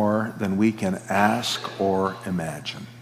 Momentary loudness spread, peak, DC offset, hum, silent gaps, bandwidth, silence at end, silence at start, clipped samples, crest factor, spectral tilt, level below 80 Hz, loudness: 8 LU; -4 dBFS; under 0.1%; none; none; 16 kHz; 0 s; 0 s; under 0.1%; 20 dB; -5 dB/octave; -66 dBFS; -24 LUFS